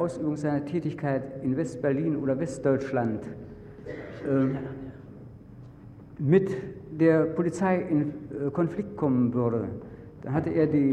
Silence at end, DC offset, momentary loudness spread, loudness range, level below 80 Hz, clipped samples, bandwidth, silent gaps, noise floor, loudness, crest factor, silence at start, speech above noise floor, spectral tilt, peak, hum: 0 s; under 0.1%; 21 LU; 5 LU; -56 dBFS; under 0.1%; 9.8 kHz; none; -47 dBFS; -27 LUFS; 18 dB; 0 s; 20 dB; -8.5 dB/octave; -8 dBFS; none